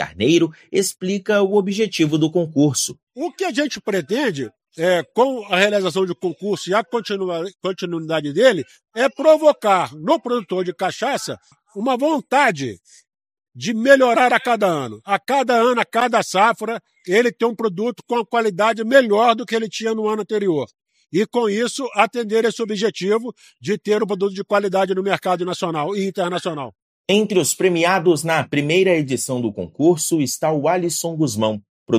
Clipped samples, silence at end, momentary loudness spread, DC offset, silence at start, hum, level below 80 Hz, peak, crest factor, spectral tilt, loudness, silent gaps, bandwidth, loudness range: under 0.1%; 0 s; 10 LU; under 0.1%; 0 s; none; -68 dBFS; 0 dBFS; 18 dB; -4.5 dB/octave; -19 LUFS; 3.03-3.07 s, 26.82-27.04 s, 31.69-31.86 s; 15.5 kHz; 3 LU